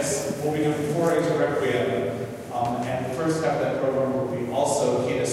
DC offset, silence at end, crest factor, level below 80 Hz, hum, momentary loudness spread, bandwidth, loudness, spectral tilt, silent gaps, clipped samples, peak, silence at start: under 0.1%; 0 s; 14 dB; -58 dBFS; none; 5 LU; 16 kHz; -25 LUFS; -5 dB/octave; none; under 0.1%; -10 dBFS; 0 s